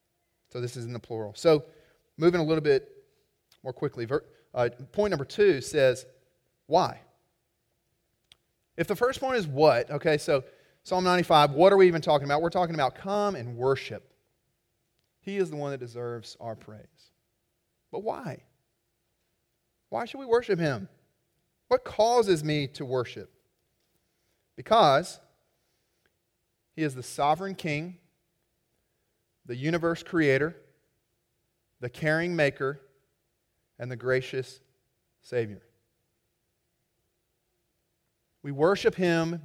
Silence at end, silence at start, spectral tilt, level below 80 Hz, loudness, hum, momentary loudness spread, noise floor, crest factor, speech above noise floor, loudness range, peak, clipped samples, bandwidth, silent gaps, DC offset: 0.05 s; 0.55 s; -5.5 dB/octave; -64 dBFS; -27 LUFS; none; 18 LU; -77 dBFS; 22 dB; 51 dB; 14 LU; -6 dBFS; under 0.1%; 16 kHz; none; under 0.1%